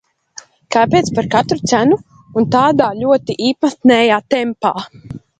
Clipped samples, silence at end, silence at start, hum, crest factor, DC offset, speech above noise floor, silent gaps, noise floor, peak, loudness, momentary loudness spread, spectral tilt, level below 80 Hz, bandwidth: under 0.1%; 0.2 s; 0.7 s; none; 14 dB; under 0.1%; 26 dB; none; -40 dBFS; 0 dBFS; -14 LUFS; 7 LU; -5 dB/octave; -50 dBFS; 9.2 kHz